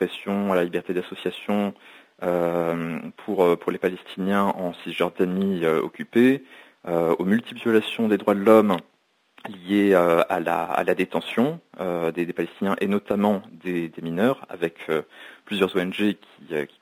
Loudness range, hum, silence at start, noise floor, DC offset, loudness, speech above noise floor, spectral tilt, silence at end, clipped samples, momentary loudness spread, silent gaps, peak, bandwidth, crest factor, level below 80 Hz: 5 LU; none; 0 s; -58 dBFS; under 0.1%; -24 LUFS; 35 dB; -7 dB/octave; 0.15 s; under 0.1%; 11 LU; none; -4 dBFS; 16 kHz; 20 dB; -64 dBFS